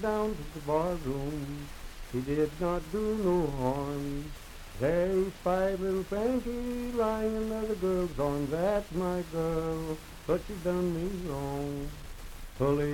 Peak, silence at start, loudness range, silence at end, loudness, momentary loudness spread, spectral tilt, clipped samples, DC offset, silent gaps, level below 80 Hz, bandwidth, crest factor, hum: -14 dBFS; 0 s; 3 LU; 0 s; -32 LUFS; 11 LU; -7 dB/octave; under 0.1%; under 0.1%; none; -44 dBFS; 18 kHz; 16 dB; none